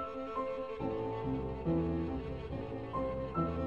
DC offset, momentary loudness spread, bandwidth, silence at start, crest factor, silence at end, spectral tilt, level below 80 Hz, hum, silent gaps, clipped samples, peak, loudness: 0.1%; 7 LU; 7 kHz; 0 s; 16 dB; 0 s; -9.5 dB/octave; -48 dBFS; none; none; under 0.1%; -22 dBFS; -37 LUFS